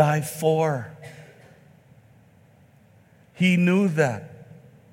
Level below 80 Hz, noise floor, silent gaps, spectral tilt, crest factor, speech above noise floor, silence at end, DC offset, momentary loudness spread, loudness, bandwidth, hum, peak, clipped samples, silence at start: -70 dBFS; -55 dBFS; none; -6.5 dB/octave; 20 dB; 34 dB; 0.5 s; under 0.1%; 23 LU; -22 LUFS; 16.5 kHz; none; -4 dBFS; under 0.1%; 0 s